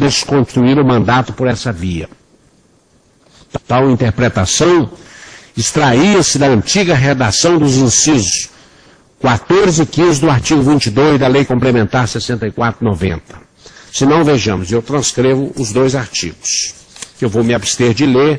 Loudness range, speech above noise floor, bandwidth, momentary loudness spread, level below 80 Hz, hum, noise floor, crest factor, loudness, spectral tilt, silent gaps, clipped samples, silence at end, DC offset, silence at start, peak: 4 LU; 40 dB; 10.5 kHz; 9 LU; -38 dBFS; none; -51 dBFS; 12 dB; -12 LUFS; -4.5 dB/octave; none; under 0.1%; 0 s; under 0.1%; 0 s; 0 dBFS